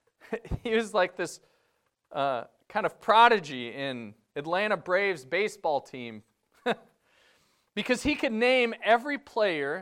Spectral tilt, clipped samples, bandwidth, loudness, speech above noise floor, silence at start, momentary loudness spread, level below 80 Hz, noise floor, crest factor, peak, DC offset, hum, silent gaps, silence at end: -4 dB/octave; under 0.1%; 15.5 kHz; -27 LUFS; 47 dB; 0.3 s; 15 LU; -56 dBFS; -74 dBFS; 22 dB; -6 dBFS; under 0.1%; none; none; 0 s